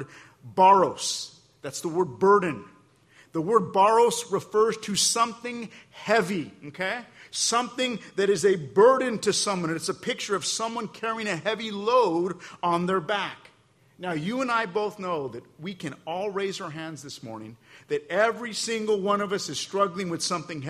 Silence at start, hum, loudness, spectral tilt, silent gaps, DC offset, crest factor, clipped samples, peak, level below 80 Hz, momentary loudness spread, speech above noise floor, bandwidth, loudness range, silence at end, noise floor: 0 s; none; -25 LUFS; -3.5 dB/octave; none; under 0.1%; 20 dB; under 0.1%; -6 dBFS; -70 dBFS; 16 LU; 35 dB; 14.5 kHz; 7 LU; 0 s; -60 dBFS